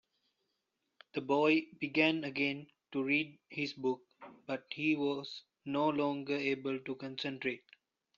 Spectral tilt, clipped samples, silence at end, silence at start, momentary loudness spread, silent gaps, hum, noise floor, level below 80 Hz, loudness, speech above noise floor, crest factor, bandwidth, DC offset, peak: -3 dB/octave; under 0.1%; 0.6 s; 1.15 s; 12 LU; none; none; -84 dBFS; -80 dBFS; -35 LUFS; 50 dB; 22 dB; 7.2 kHz; under 0.1%; -14 dBFS